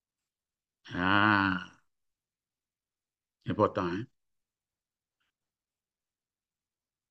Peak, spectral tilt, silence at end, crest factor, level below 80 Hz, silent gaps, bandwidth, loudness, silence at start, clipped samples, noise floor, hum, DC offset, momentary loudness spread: -10 dBFS; -7 dB/octave; 3.05 s; 26 dB; -68 dBFS; none; 7.4 kHz; -29 LUFS; 0.85 s; under 0.1%; under -90 dBFS; none; under 0.1%; 21 LU